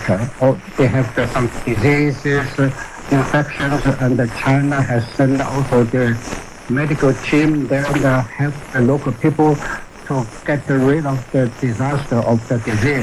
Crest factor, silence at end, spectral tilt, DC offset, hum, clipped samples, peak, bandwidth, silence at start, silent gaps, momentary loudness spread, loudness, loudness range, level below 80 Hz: 14 dB; 0 s; -7 dB/octave; under 0.1%; none; under 0.1%; -4 dBFS; 13 kHz; 0 s; none; 6 LU; -17 LUFS; 1 LU; -36 dBFS